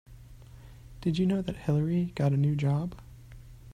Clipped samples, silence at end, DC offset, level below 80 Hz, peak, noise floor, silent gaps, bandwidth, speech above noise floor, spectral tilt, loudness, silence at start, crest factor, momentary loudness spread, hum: under 0.1%; 0 s; under 0.1%; -52 dBFS; -14 dBFS; -49 dBFS; none; 9.8 kHz; 22 dB; -8.5 dB/octave; -29 LUFS; 0.1 s; 16 dB; 11 LU; none